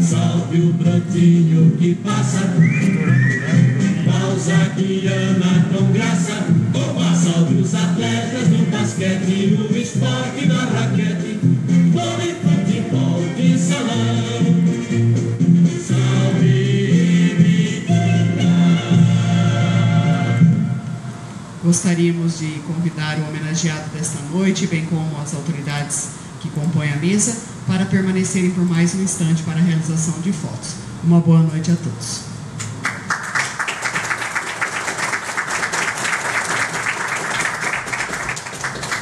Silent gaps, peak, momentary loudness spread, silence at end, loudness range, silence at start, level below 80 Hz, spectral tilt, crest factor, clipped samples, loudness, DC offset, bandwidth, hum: none; -2 dBFS; 9 LU; 0 s; 6 LU; 0 s; -54 dBFS; -5.5 dB/octave; 16 dB; under 0.1%; -17 LUFS; under 0.1%; 12 kHz; none